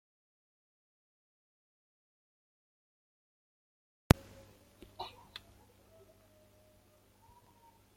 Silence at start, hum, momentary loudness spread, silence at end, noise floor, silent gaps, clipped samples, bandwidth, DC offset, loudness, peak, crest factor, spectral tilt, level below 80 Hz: 5 s; 50 Hz at -65 dBFS; 28 LU; 2.95 s; -66 dBFS; none; under 0.1%; 16.5 kHz; under 0.1%; -34 LUFS; -4 dBFS; 40 dB; -6 dB/octave; -54 dBFS